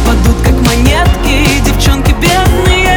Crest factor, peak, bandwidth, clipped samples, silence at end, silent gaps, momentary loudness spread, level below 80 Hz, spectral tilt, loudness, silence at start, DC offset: 8 dB; 0 dBFS; over 20 kHz; under 0.1%; 0 s; none; 1 LU; -12 dBFS; -5 dB/octave; -9 LUFS; 0 s; under 0.1%